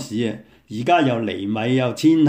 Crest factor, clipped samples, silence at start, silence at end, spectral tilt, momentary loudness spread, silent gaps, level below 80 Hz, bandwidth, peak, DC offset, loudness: 16 dB; under 0.1%; 0 s; 0 s; -6.5 dB/octave; 11 LU; none; -62 dBFS; 15.5 kHz; -4 dBFS; under 0.1%; -20 LUFS